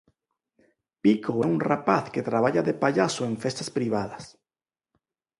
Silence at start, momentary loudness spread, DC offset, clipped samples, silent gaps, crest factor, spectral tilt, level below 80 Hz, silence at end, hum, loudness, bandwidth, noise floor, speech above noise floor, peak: 1.05 s; 6 LU; under 0.1%; under 0.1%; none; 22 dB; -6 dB/octave; -66 dBFS; 1.1 s; none; -25 LUFS; 11.5 kHz; under -90 dBFS; over 65 dB; -6 dBFS